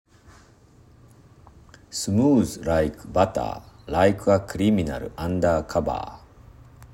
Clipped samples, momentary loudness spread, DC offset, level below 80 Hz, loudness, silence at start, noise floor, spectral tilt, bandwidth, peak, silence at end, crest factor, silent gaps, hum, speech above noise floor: under 0.1%; 12 LU; under 0.1%; -46 dBFS; -23 LUFS; 1.9 s; -53 dBFS; -6 dB/octave; 16 kHz; -4 dBFS; 0.05 s; 20 dB; none; none; 31 dB